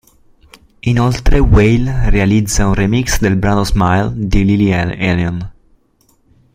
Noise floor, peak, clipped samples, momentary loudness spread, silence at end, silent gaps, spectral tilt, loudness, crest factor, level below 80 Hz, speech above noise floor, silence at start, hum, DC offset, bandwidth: -55 dBFS; 0 dBFS; under 0.1%; 6 LU; 1.05 s; none; -6 dB/octave; -14 LUFS; 12 dB; -20 dBFS; 44 dB; 0.85 s; none; under 0.1%; 16 kHz